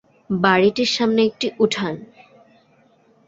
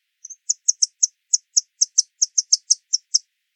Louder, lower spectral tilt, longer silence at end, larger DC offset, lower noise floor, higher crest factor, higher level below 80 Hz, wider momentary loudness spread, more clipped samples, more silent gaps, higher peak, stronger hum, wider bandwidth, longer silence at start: about the same, -19 LUFS vs -19 LUFS; first, -5 dB/octave vs 14 dB/octave; first, 1.2 s vs 0.35 s; neither; first, -57 dBFS vs -40 dBFS; about the same, 18 dB vs 22 dB; first, -60 dBFS vs under -90 dBFS; first, 11 LU vs 5 LU; neither; neither; about the same, -2 dBFS vs -2 dBFS; neither; second, 7.8 kHz vs 11 kHz; about the same, 0.3 s vs 0.3 s